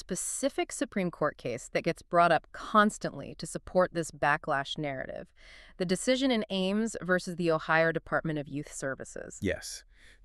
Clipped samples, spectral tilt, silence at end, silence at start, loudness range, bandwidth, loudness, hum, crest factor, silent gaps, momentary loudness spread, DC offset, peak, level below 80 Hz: under 0.1%; -4.5 dB/octave; 0.15 s; 0 s; 3 LU; 13.5 kHz; -30 LUFS; none; 20 dB; none; 13 LU; under 0.1%; -10 dBFS; -56 dBFS